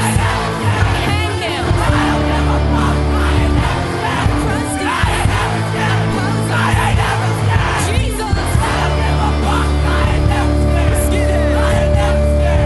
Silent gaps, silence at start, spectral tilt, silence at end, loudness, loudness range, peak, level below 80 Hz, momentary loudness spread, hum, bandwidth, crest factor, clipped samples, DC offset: none; 0 s; -5.5 dB/octave; 0 s; -15 LUFS; 1 LU; -2 dBFS; -18 dBFS; 3 LU; none; 12 kHz; 12 dB; under 0.1%; under 0.1%